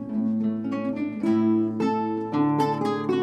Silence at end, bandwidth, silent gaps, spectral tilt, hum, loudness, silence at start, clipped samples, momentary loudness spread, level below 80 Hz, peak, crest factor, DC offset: 0 s; 11.5 kHz; none; -8 dB/octave; none; -25 LUFS; 0 s; under 0.1%; 6 LU; -68 dBFS; -10 dBFS; 14 dB; under 0.1%